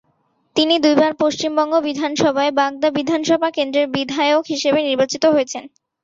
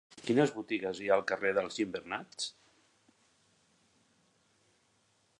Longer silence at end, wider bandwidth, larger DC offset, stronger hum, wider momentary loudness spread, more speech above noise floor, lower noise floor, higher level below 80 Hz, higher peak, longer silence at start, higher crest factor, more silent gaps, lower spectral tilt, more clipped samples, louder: second, 0.35 s vs 2.9 s; second, 7.8 kHz vs 11 kHz; neither; neither; second, 5 LU vs 10 LU; first, 47 dB vs 40 dB; second, -64 dBFS vs -72 dBFS; first, -62 dBFS vs -76 dBFS; first, -2 dBFS vs -12 dBFS; first, 0.55 s vs 0.15 s; second, 16 dB vs 24 dB; neither; about the same, -3.5 dB/octave vs -4.5 dB/octave; neither; first, -17 LUFS vs -33 LUFS